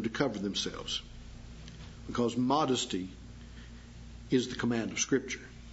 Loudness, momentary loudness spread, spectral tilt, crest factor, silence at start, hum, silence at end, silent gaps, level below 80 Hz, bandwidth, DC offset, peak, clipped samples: -32 LUFS; 21 LU; -4 dB/octave; 22 dB; 0 s; 60 Hz at -55 dBFS; 0 s; none; -52 dBFS; 8 kHz; under 0.1%; -12 dBFS; under 0.1%